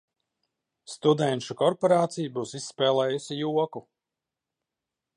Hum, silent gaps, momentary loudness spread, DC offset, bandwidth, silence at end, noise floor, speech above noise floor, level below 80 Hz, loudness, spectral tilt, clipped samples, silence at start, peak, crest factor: none; none; 10 LU; under 0.1%; 11 kHz; 1.35 s; -88 dBFS; 62 dB; -78 dBFS; -26 LUFS; -5.5 dB/octave; under 0.1%; 0.9 s; -8 dBFS; 20 dB